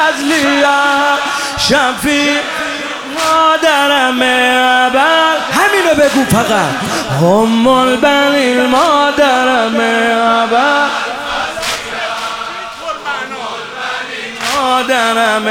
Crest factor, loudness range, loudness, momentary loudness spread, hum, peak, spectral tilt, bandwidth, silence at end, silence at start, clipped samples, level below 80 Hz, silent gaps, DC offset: 12 dB; 7 LU; -11 LUFS; 10 LU; none; 0 dBFS; -3.5 dB/octave; 18.5 kHz; 0 s; 0 s; under 0.1%; -44 dBFS; none; under 0.1%